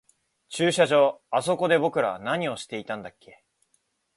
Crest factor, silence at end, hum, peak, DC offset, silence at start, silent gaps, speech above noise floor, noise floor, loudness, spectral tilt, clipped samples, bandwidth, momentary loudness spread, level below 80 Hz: 20 dB; 1.1 s; none; -6 dBFS; under 0.1%; 0.5 s; none; 47 dB; -71 dBFS; -24 LUFS; -4.5 dB/octave; under 0.1%; 11.5 kHz; 15 LU; -70 dBFS